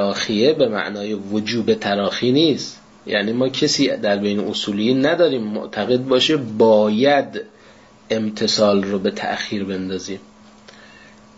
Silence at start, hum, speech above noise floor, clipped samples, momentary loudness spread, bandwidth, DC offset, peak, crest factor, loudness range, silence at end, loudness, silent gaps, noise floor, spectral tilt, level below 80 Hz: 0 s; none; 29 dB; under 0.1%; 10 LU; 8 kHz; under 0.1%; -4 dBFS; 16 dB; 4 LU; 1.2 s; -19 LUFS; none; -47 dBFS; -4.5 dB/octave; -60 dBFS